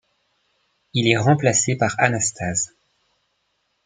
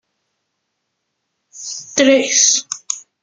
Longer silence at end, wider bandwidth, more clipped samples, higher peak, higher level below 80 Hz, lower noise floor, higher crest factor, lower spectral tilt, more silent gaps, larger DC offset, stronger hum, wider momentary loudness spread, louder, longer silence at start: first, 1.2 s vs 0.25 s; about the same, 9.6 kHz vs 10.5 kHz; neither; about the same, -2 dBFS vs 0 dBFS; first, -58 dBFS vs -66 dBFS; about the same, -71 dBFS vs -74 dBFS; about the same, 22 dB vs 18 dB; first, -4 dB/octave vs 0 dB/octave; neither; neither; neither; second, 8 LU vs 17 LU; second, -20 LUFS vs -13 LUFS; second, 0.95 s vs 1.55 s